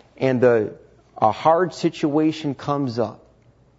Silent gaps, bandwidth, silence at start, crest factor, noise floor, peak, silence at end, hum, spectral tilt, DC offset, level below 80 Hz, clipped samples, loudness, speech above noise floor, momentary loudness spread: none; 8 kHz; 0.2 s; 18 dB; -55 dBFS; -4 dBFS; 0.65 s; none; -7 dB/octave; under 0.1%; -60 dBFS; under 0.1%; -21 LUFS; 35 dB; 9 LU